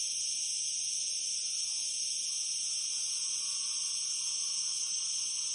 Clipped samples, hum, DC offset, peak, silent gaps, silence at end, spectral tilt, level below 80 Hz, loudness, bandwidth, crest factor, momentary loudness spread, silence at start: under 0.1%; none; under 0.1%; -20 dBFS; none; 0 s; 4.5 dB/octave; -90 dBFS; -31 LUFS; 11.5 kHz; 14 dB; 1 LU; 0 s